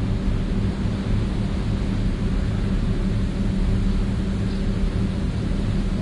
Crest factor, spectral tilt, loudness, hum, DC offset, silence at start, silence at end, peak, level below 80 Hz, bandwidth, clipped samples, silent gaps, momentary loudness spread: 12 dB; -7.5 dB/octave; -24 LUFS; none; under 0.1%; 0 s; 0 s; -10 dBFS; -24 dBFS; 11 kHz; under 0.1%; none; 2 LU